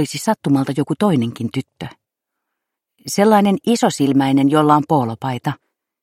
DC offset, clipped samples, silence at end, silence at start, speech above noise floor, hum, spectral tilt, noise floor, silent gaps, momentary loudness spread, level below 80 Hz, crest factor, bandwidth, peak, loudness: under 0.1%; under 0.1%; 0.45 s; 0 s; 63 dB; none; -6 dB/octave; -79 dBFS; none; 15 LU; -62 dBFS; 16 dB; 16 kHz; 0 dBFS; -17 LUFS